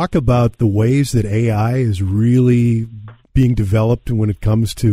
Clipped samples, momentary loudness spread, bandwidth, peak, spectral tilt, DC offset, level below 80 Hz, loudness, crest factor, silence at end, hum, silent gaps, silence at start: under 0.1%; 4 LU; 14 kHz; -2 dBFS; -8 dB/octave; under 0.1%; -30 dBFS; -16 LUFS; 12 dB; 0 s; none; none; 0 s